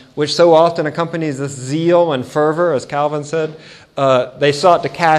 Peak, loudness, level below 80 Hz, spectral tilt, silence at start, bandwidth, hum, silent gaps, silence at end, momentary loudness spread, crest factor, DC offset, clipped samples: 0 dBFS; -15 LUFS; -58 dBFS; -5.5 dB/octave; 0.15 s; 12 kHz; none; none; 0 s; 10 LU; 14 dB; under 0.1%; under 0.1%